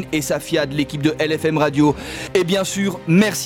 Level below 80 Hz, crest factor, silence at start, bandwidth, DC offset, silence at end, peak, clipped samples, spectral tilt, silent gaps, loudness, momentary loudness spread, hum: -46 dBFS; 16 dB; 0 s; 17.5 kHz; under 0.1%; 0 s; -2 dBFS; under 0.1%; -5 dB/octave; none; -19 LUFS; 5 LU; none